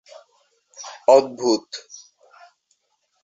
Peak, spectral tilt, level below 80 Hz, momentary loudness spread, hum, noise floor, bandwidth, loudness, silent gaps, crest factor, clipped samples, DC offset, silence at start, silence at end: -2 dBFS; -3.5 dB/octave; -74 dBFS; 25 LU; none; -71 dBFS; 7.8 kHz; -19 LUFS; none; 22 dB; under 0.1%; under 0.1%; 0.8 s; 1.45 s